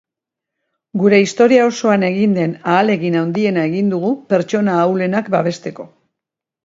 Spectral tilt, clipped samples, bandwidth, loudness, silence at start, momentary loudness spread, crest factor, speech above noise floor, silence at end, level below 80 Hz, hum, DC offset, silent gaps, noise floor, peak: -6.5 dB/octave; under 0.1%; 7.8 kHz; -15 LUFS; 0.95 s; 8 LU; 16 dB; 69 dB; 0.8 s; -64 dBFS; none; under 0.1%; none; -84 dBFS; 0 dBFS